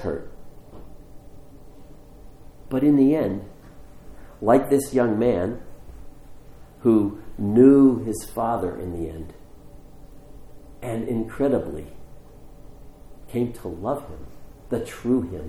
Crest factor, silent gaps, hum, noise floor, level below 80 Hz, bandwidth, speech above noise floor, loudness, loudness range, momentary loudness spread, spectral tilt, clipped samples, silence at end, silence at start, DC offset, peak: 20 dB; none; none; -44 dBFS; -46 dBFS; 14 kHz; 22 dB; -22 LUFS; 10 LU; 18 LU; -7.5 dB/octave; under 0.1%; 0 s; 0 s; under 0.1%; -4 dBFS